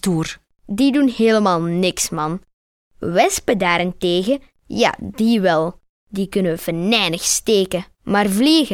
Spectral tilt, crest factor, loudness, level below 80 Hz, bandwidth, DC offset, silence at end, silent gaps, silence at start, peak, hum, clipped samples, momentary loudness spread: -4 dB/octave; 16 dB; -18 LUFS; -48 dBFS; 17 kHz; under 0.1%; 0 s; 2.53-2.91 s, 5.89-6.07 s; 0.05 s; -2 dBFS; none; under 0.1%; 11 LU